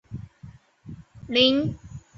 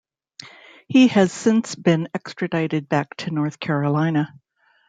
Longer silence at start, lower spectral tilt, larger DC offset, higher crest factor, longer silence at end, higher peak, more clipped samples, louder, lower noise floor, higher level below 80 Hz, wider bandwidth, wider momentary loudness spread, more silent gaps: second, 0.1 s vs 0.4 s; about the same, -6 dB/octave vs -6 dB/octave; neither; about the same, 22 dB vs 18 dB; second, 0.2 s vs 0.6 s; about the same, -4 dBFS vs -4 dBFS; neither; about the same, -21 LUFS vs -21 LUFS; about the same, -48 dBFS vs -45 dBFS; first, -52 dBFS vs -66 dBFS; second, 7.4 kHz vs 9.2 kHz; first, 25 LU vs 14 LU; neither